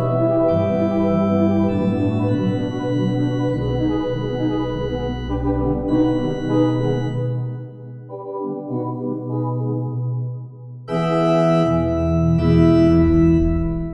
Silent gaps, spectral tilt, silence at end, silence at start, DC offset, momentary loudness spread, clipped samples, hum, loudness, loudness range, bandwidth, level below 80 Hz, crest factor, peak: none; -9 dB/octave; 0 s; 0 s; under 0.1%; 12 LU; under 0.1%; none; -19 LUFS; 8 LU; 8.2 kHz; -34 dBFS; 16 dB; -2 dBFS